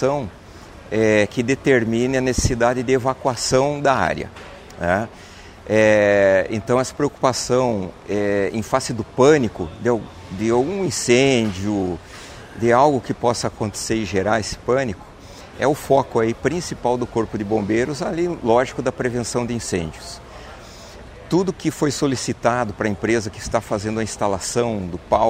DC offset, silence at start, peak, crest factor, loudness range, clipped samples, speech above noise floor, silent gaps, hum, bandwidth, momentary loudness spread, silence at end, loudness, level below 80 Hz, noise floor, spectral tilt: under 0.1%; 0 s; -2 dBFS; 18 dB; 5 LU; under 0.1%; 21 dB; none; none; 16 kHz; 18 LU; 0 s; -20 LUFS; -42 dBFS; -40 dBFS; -5 dB/octave